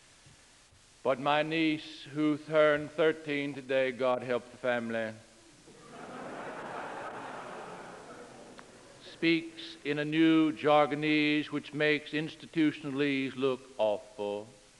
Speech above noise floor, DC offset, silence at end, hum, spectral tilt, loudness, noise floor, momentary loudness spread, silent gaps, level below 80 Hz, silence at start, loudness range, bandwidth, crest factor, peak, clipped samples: 30 dB; under 0.1%; 0.25 s; none; -6 dB/octave; -31 LUFS; -60 dBFS; 19 LU; none; -72 dBFS; 1.05 s; 14 LU; 11.5 kHz; 20 dB; -12 dBFS; under 0.1%